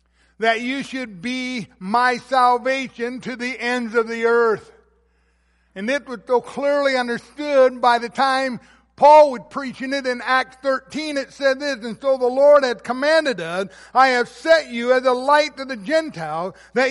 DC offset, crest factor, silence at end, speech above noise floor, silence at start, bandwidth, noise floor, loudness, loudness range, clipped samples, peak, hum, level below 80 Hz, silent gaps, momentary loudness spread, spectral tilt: under 0.1%; 16 dB; 0 s; 43 dB; 0.4 s; 11.5 kHz; -62 dBFS; -19 LUFS; 5 LU; under 0.1%; -2 dBFS; none; -62 dBFS; none; 12 LU; -4 dB/octave